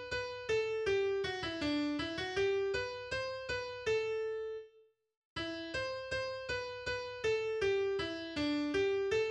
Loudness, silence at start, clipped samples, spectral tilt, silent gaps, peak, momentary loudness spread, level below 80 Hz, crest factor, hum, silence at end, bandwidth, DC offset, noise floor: -36 LUFS; 0 s; under 0.1%; -4.5 dB/octave; 5.17-5.36 s; -22 dBFS; 6 LU; -60 dBFS; 14 dB; none; 0 s; 9.8 kHz; under 0.1%; -67 dBFS